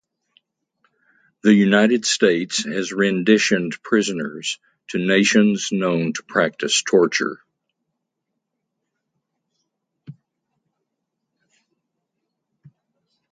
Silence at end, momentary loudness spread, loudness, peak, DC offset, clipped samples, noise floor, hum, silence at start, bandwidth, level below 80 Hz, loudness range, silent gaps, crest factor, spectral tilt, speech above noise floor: 3.2 s; 10 LU; -19 LUFS; 0 dBFS; under 0.1%; under 0.1%; -79 dBFS; none; 1.45 s; 9.4 kHz; -68 dBFS; 6 LU; none; 22 dB; -4 dB/octave; 60 dB